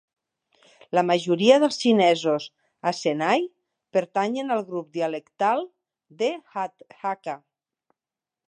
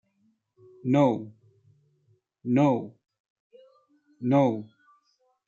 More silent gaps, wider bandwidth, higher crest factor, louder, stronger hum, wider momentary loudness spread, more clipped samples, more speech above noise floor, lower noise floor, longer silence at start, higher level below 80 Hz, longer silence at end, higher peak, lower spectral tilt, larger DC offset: second, none vs 3.20-3.24 s, 3.30-3.50 s; first, 10 kHz vs 7.4 kHz; about the same, 22 dB vs 20 dB; about the same, -24 LUFS vs -25 LUFS; neither; about the same, 14 LU vs 16 LU; neither; first, over 67 dB vs 47 dB; first, under -90 dBFS vs -70 dBFS; about the same, 0.95 s vs 0.85 s; about the same, -80 dBFS vs -76 dBFS; first, 1.1 s vs 0.8 s; first, -4 dBFS vs -8 dBFS; second, -5 dB/octave vs -9 dB/octave; neither